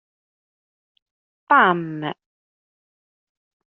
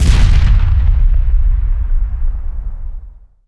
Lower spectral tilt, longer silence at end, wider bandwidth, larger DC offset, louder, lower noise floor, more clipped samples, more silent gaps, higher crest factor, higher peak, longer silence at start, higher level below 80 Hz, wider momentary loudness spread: second, -3 dB/octave vs -6 dB/octave; first, 1.6 s vs 0.35 s; second, 4.1 kHz vs 11 kHz; neither; about the same, -18 LUFS vs -16 LUFS; first, under -90 dBFS vs -32 dBFS; neither; neither; first, 24 dB vs 10 dB; about the same, -2 dBFS vs 0 dBFS; first, 1.5 s vs 0 s; second, -76 dBFS vs -12 dBFS; about the same, 17 LU vs 16 LU